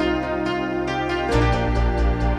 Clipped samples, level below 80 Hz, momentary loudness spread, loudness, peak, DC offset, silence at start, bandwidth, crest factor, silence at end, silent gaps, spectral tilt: under 0.1%; -26 dBFS; 4 LU; -22 LUFS; -6 dBFS; under 0.1%; 0 s; 9.4 kHz; 14 dB; 0 s; none; -7 dB/octave